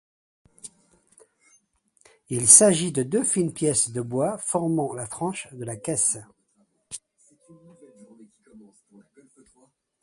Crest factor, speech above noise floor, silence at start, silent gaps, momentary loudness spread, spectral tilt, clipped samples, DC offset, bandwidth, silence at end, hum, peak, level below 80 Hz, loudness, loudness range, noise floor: 26 dB; 45 dB; 0.65 s; none; 27 LU; -3.5 dB/octave; under 0.1%; under 0.1%; 12 kHz; 1.45 s; none; 0 dBFS; -64 dBFS; -21 LUFS; 11 LU; -68 dBFS